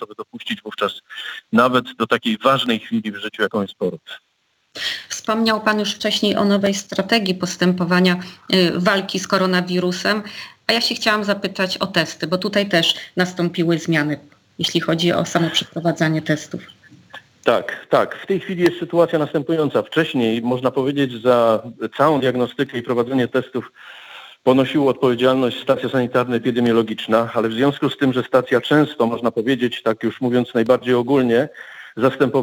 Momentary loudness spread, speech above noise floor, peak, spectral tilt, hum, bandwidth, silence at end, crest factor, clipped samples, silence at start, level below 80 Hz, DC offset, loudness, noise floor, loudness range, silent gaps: 9 LU; 47 dB; -2 dBFS; -5 dB/octave; none; 19 kHz; 0 s; 18 dB; under 0.1%; 0 s; -64 dBFS; under 0.1%; -19 LUFS; -66 dBFS; 3 LU; none